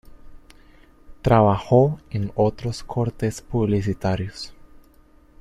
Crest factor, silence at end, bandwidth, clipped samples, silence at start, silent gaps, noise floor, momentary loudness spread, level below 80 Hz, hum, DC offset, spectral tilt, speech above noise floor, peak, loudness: 20 dB; 0.85 s; 13 kHz; under 0.1%; 0.1 s; none; -52 dBFS; 12 LU; -42 dBFS; none; under 0.1%; -7.5 dB/octave; 32 dB; -4 dBFS; -22 LUFS